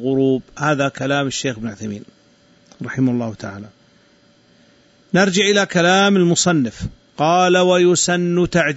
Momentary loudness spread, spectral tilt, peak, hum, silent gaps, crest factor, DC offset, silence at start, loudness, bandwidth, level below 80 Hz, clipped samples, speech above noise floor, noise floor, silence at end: 17 LU; -4.5 dB/octave; -4 dBFS; none; none; 14 dB; under 0.1%; 0 s; -16 LUFS; 8.2 kHz; -48 dBFS; under 0.1%; 37 dB; -53 dBFS; 0 s